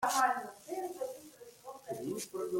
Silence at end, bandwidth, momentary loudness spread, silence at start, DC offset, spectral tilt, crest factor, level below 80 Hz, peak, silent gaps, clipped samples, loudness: 0 s; 16.5 kHz; 20 LU; 0 s; under 0.1%; -2.5 dB/octave; 20 dB; -78 dBFS; -16 dBFS; none; under 0.1%; -37 LUFS